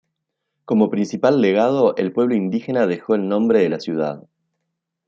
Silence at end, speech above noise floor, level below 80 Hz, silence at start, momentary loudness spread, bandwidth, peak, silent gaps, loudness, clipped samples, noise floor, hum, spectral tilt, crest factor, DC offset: 0.85 s; 60 dB; -66 dBFS; 0.7 s; 7 LU; 7.4 kHz; -2 dBFS; none; -19 LUFS; under 0.1%; -78 dBFS; none; -7.5 dB/octave; 18 dB; under 0.1%